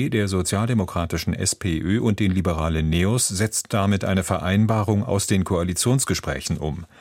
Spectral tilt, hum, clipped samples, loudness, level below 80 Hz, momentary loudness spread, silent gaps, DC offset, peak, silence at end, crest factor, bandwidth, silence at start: -5 dB/octave; none; under 0.1%; -22 LUFS; -38 dBFS; 5 LU; none; under 0.1%; -6 dBFS; 0.15 s; 16 dB; 16.5 kHz; 0 s